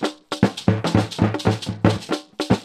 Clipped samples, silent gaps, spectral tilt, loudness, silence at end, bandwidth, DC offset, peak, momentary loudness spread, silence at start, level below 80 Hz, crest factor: under 0.1%; none; -6.5 dB/octave; -22 LUFS; 0 s; 13 kHz; under 0.1%; -2 dBFS; 7 LU; 0 s; -44 dBFS; 20 dB